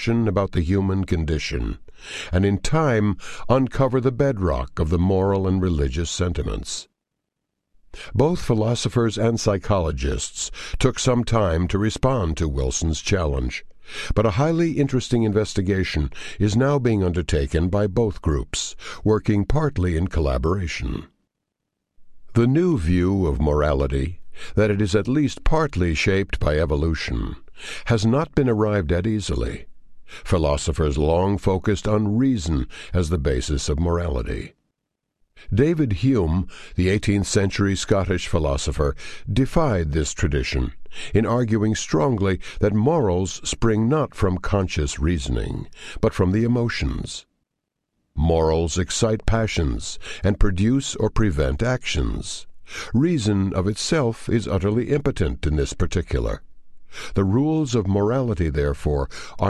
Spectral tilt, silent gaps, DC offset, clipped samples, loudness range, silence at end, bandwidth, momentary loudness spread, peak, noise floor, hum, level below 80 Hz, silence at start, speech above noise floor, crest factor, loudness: -6 dB/octave; none; under 0.1%; under 0.1%; 3 LU; 0 s; 12 kHz; 9 LU; -2 dBFS; -80 dBFS; none; -30 dBFS; 0 s; 59 dB; 18 dB; -22 LUFS